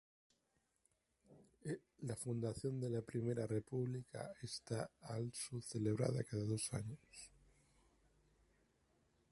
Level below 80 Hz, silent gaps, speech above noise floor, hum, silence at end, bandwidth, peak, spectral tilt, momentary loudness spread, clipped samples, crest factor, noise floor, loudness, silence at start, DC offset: -72 dBFS; none; 40 dB; none; 2.05 s; 11.5 kHz; -24 dBFS; -6 dB/octave; 11 LU; under 0.1%; 22 dB; -84 dBFS; -44 LUFS; 1.3 s; under 0.1%